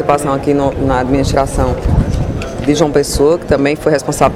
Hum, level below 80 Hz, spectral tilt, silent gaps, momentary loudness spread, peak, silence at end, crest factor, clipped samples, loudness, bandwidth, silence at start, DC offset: none; -22 dBFS; -6 dB/octave; none; 4 LU; 0 dBFS; 0 s; 12 dB; under 0.1%; -14 LUFS; 15.5 kHz; 0 s; under 0.1%